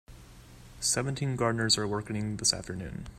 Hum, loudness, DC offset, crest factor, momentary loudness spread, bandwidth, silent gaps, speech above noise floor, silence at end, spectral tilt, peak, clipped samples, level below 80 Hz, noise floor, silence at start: none; -29 LUFS; under 0.1%; 22 dB; 8 LU; 15.5 kHz; none; 20 dB; 0 s; -3 dB/octave; -10 dBFS; under 0.1%; -52 dBFS; -51 dBFS; 0.1 s